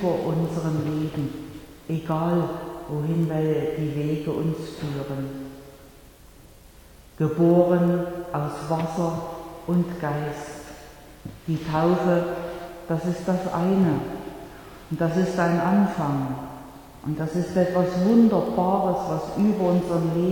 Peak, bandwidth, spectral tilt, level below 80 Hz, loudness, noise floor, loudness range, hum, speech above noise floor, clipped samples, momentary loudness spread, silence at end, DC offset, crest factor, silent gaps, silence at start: -6 dBFS; 18.5 kHz; -8 dB/octave; -50 dBFS; -24 LUFS; -48 dBFS; 6 LU; none; 25 dB; under 0.1%; 17 LU; 0 s; under 0.1%; 18 dB; none; 0 s